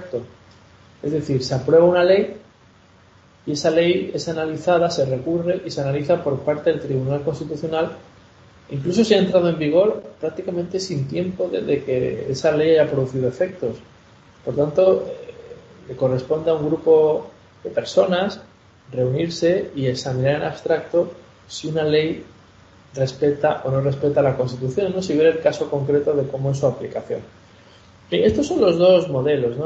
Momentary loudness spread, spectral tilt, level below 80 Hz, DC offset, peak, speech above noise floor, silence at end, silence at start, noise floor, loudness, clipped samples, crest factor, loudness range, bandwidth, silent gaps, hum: 12 LU; -6.5 dB/octave; -54 dBFS; under 0.1%; -2 dBFS; 32 dB; 0 s; 0 s; -51 dBFS; -20 LUFS; under 0.1%; 18 dB; 3 LU; 8.2 kHz; none; none